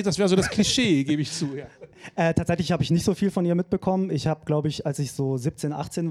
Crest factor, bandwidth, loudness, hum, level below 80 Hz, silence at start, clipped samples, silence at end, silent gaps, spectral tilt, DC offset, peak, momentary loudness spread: 18 dB; 14 kHz; -24 LUFS; none; -50 dBFS; 0 s; under 0.1%; 0 s; none; -5.5 dB/octave; under 0.1%; -6 dBFS; 9 LU